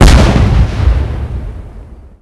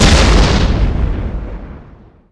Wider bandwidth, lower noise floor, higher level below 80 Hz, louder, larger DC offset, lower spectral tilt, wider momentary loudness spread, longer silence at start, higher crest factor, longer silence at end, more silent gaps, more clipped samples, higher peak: about the same, 12 kHz vs 11 kHz; second, -31 dBFS vs -40 dBFS; about the same, -12 dBFS vs -14 dBFS; about the same, -11 LUFS vs -13 LUFS; neither; about the same, -6 dB/octave vs -5 dB/octave; about the same, 21 LU vs 20 LU; about the same, 0 s vs 0 s; about the same, 10 dB vs 12 dB; second, 0.25 s vs 0.5 s; neither; first, 3% vs under 0.1%; about the same, 0 dBFS vs -2 dBFS